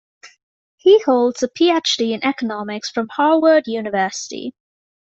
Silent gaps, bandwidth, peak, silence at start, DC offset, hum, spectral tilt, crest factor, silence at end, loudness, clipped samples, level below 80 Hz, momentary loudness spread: 0.43-0.78 s; 8.2 kHz; -2 dBFS; 0.25 s; under 0.1%; none; -3.5 dB/octave; 16 dB; 0.65 s; -17 LUFS; under 0.1%; -66 dBFS; 12 LU